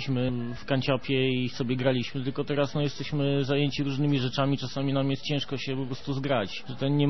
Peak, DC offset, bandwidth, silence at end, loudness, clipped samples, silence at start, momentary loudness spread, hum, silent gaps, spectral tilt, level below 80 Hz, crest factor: -10 dBFS; 1%; 6.2 kHz; 0 s; -28 LUFS; under 0.1%; 0 s; 6 LU; none; none; -7 dB/octave; -56 dBFS; 18 dB